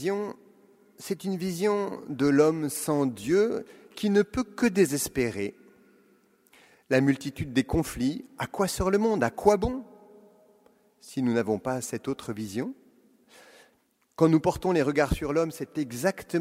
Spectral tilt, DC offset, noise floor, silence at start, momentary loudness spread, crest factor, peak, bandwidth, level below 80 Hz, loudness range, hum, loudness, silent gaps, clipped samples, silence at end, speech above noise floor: -5.5 dB/octave; under 0.1%; -68 dBFS; 0 s; 11 LU; 22 dB; -6 dBFS; 16 kHz; -48 dBFS; 7 LU; none; -27 LUFS; none; under 0.1%; 0 s; 42 dB